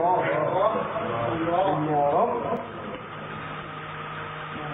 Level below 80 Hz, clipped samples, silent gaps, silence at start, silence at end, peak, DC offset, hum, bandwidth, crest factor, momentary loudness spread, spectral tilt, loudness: -58 dBFS; under 0.1%; none; 0 s; 0 s; -10 dBFS; under 0.1%; none; 3.9 kHz; 16 dB; 12 LU; -9.5 dB/octave; -27 LUFS